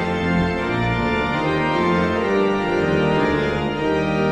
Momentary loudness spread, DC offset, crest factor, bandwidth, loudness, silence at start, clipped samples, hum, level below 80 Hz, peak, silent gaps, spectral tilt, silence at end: 3 LU; under 0.1%; 12 dB; 10 kHz; -20 LUFS; 0 s; under 0.1%; none; -38 dBFS; -8 dBFS; none; -7 dB/octave; 0 s